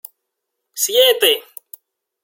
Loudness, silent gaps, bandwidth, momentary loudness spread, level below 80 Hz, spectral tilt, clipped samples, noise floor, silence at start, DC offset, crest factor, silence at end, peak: -14 LUFS; none; 17 kHz; 22 LU; -76 dBFS; 2 dB/octave; under 0.1%; -78 dBFS; 0.75 s; under 0.1%; 20 dB; 0.85 s; 0 dBFS